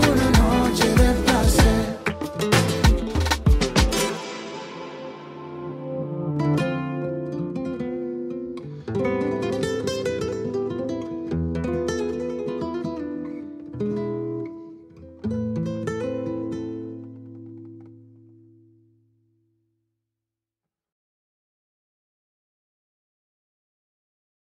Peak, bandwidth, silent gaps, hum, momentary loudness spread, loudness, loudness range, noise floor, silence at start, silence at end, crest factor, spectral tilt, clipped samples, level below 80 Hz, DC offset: -4 dBFS; 16 kHz; none; none; 18 LU; -24 LUFS; 11 LU; -88 dBFS; 0 s; 6.5 s; 22 dB; -5.5 dB/octave; under 0.1%; -32 dBFS; under 0.1%